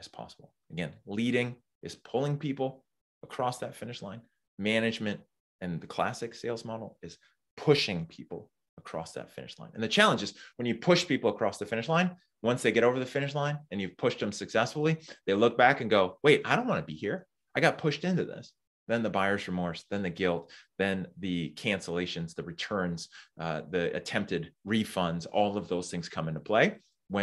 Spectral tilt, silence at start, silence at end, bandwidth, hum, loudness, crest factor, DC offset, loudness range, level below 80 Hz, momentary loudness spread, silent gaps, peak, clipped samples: -5 dB/octave; 0 s; 0 s; 12.5 kHz; none; -30 LUFS; 26 dB; under 0.1%; 7 LU; -68 dBFS; 17 LU; 1.75-1.81 s, 3.01-3.21 s, 4.48-4.58 s, 5.40-5.59 s, 7.51-7.57 s, 8.69-8.77 s, 18.67-18.86 s; -6 dBFS; under 0.1%